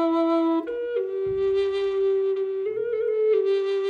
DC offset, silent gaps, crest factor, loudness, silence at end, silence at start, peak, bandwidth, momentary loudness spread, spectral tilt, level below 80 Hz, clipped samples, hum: under 0.1%; none; 10 dB; -24 LUFS; 0 s; 0 s; -14 dBFS; 6.2 kHz; 6 LU; -6.5 dB/octave; -60 dBFS; under 0.1%; none